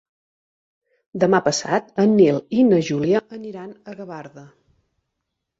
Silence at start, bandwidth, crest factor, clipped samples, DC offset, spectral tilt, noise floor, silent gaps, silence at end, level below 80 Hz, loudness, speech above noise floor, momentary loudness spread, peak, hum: 1.15 s; 8 kHz; 18 dB; under 0.1%; under 0.1%; -5.5 dB/octave; -79 dBFS; none; 1.15 s; -62 dBFS; -18 LUFS; 60 dB; 20 LU; -4 dBFS; none